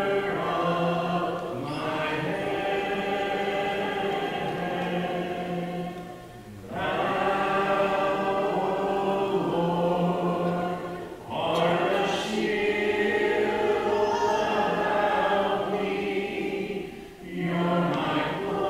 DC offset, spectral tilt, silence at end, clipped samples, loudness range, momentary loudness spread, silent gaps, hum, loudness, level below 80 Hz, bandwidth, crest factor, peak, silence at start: under 0.1%; -6 dB/octave; 0 s; under 0.1%; 4 LU; 8 LU; none; none; -27 LUFS; -56 dBFS; 15.5 kHz; 14 dB; -12 dBFS; 0 s